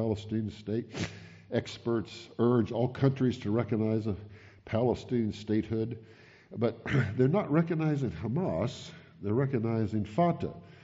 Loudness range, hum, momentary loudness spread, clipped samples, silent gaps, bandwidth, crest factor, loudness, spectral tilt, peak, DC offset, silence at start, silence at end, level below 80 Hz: 2 LU; none; 11 LU; under 0.1%; none; 7.8 kHz; 18 dB; -31 LUFS; -7.5 dB/octave; -14 dBFS; under 0.1%; 0 s; 0.05 s; -60 dBFS